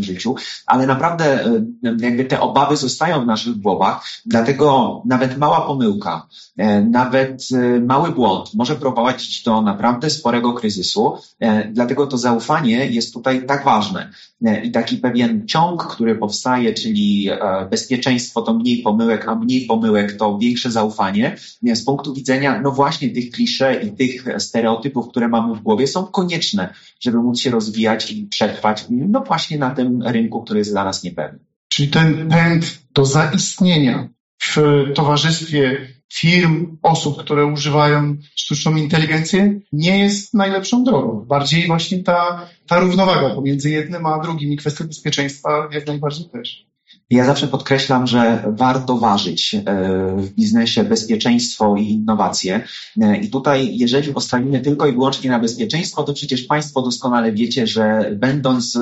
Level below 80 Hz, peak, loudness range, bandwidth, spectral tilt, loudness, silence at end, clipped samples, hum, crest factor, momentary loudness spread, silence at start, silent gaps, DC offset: -56 dBFS; 0 dBFS; 3 LU; 8 kHz; -4.5 dB/octave; -17 LUFS; 0 s; under 0.1%; none; 16 dB; 7 LU; 0 s; 31.56-31.70 s, 34.20-34.38 s, 36.04-36.09 s; under 0.1%